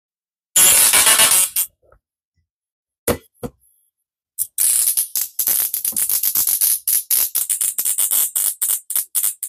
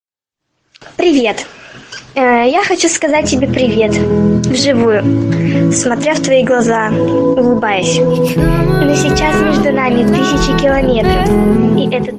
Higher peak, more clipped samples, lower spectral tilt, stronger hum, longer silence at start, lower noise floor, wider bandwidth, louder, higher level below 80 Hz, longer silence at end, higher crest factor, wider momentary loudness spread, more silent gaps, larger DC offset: about the same, -2 dBFS vs 0 dBFS; neither; second, 1 dB/octave vs -5 dB/octave; neither; second, 0.55 s vs 0.85 s; about the same, -76 dBFS vs -77 dBFS; first, 16 kHz vs 14.5 kHz; about the same, -14 LUFS vs -12 LUFS; second, -52 dBFS vs -28 dBFS; about the same, 0 s vs 0 s; first, 18 dB vs 12 dB; first, 15 LU vs 3 LU; first, 2.25-2.32 s, 2.51-2.61 s, 2.71-2.86 s, 2.98-3.07 s vs none; neither